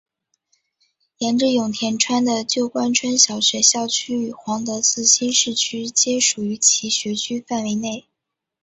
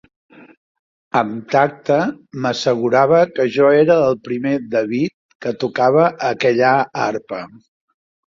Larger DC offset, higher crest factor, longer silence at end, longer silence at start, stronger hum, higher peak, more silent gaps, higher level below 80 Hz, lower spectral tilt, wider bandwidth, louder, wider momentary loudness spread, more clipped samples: neither; about the same, 20 dB vs 16 dB; second, 0.65 s vs 0.8 s; about the same, 1.2 s vs 1.15 s; neither; about the same, 0 dBFS vs -2 dBFS; second, none vs 5.14-5.29 s, 5.35-5.40 s; about the same, -64 dBFS vs -60 dBFS; second, -1.5 dB/octave vs -6 dB/octave; first, 8.4 kHz vs 7.6 kHz; about the same, -18 LUFS vs -17 LUFS; about the same, 11 LU vs 11 LU; neither